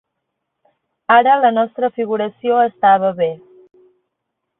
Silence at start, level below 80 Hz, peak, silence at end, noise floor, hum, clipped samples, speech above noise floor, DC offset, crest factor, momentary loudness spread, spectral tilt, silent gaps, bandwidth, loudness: 1.1 s; -66 dBFS; -2 dBFS; 1.25 s; -76 dBFS; none; under 0.1%; 62 dB; under 0.1%; 16 dB; 10 LU; -10 dB/octave; none; 4 kHz; -15 LUFS